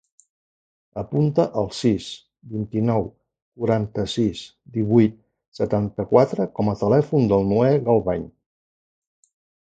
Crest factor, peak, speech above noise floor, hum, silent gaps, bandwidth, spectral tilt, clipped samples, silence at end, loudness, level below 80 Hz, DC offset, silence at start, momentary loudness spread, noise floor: 20 dB; -2 dBFS; over 70 dB; none; 3.42-3.52 s, 5.48-5.52 s; 9.2 kHz; -8 dB/octave; under 0.1%; 1.35 s; -21 LUFS; -50 dBFS; under 0.1%; 0.95 s; 15 LU; under -90 dBFS